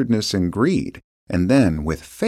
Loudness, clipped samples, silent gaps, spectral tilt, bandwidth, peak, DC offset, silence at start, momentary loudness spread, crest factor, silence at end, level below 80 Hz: -20 LUFS; under 0.1%; 1.04-1.27 s; -6 dB/octave; 14.5 kHz; -4 dBFS; under 0.1%; 0 s; 10 LU; 16 dB; 0 s; -38 dBFS